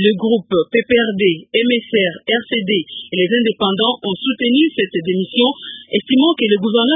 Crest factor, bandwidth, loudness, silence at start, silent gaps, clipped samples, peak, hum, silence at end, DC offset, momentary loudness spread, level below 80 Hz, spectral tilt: 14 dB; 3.9 kHz; -16 LUFS; 0 s; none; under 0.1%; -2 dBFS; none; 0 s; under 0.1%; 6 LU; -58 dBFS; -10.5 dB/octave